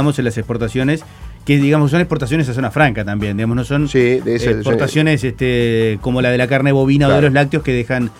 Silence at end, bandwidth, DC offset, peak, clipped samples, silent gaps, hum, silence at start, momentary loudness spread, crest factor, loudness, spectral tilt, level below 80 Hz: 0.1 s; 13.5 kHz; under 0.1%; 0 dBFS; under 0.1%; none; none; 0 s; 7 LU; 14 dB; -15 LUFS; -7 dB/octave; -36 dBFS